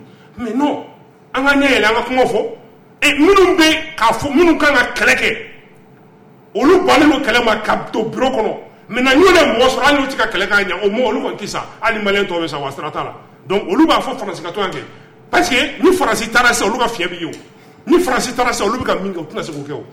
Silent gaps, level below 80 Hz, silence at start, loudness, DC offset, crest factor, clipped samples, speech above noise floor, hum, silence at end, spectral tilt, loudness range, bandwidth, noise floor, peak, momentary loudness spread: none; -40 dBFS; 0 s; -14 LUFS; under 0.1%; 14 dB; under 0.1%; 30 dB; none; 0.05 s; -3.5 dB/octave; 5 LU; 16.5 kHz; -44 dBFS; -2 dBFS; 14 LU